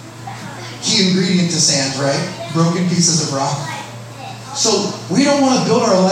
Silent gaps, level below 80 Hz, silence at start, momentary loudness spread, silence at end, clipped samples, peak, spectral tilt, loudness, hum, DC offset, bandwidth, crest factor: none; -60 dBFS; 0 s; 17 LU; 0 s; under 0.1%; -2 dBFS; -4 dB/octave; -15 LUFS; none; under 0.1%; 15 kHz; 14 dB